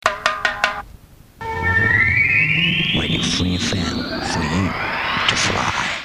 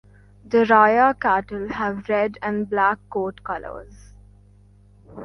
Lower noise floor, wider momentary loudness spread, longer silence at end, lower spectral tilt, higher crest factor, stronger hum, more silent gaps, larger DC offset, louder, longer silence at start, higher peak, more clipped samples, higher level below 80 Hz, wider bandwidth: second, -44 dBFS vs -51 dBFS; second, 9 LU vs 16 LU; about the same, 0 s vs 0 s; second, -3.5 dB/octave vs -7 dB/octave; about the same, 20 dB vs 20 dB; second, none vs 50 Hz at -45 dBFS; neither; neither; first, -17 LUFS vs -20 LUFS; second, 0.05 s vs 0.45 s; about the same, 0 dBFS vs -2 dBFS; neither; first, -38 dBFS vs -50 dBFS; first, 15.5 kHz vs 6.6 kHz